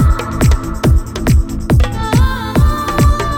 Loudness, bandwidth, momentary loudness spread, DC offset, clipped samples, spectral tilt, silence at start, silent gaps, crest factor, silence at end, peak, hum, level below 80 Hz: -14 LUFS; 17.5 kHz; 2 LU; under 0.1%; under 0.1%; -6.5 dB/octave; 0 s; none; 10 dB; 0 s; -2 dBFS; none; -14 dBFS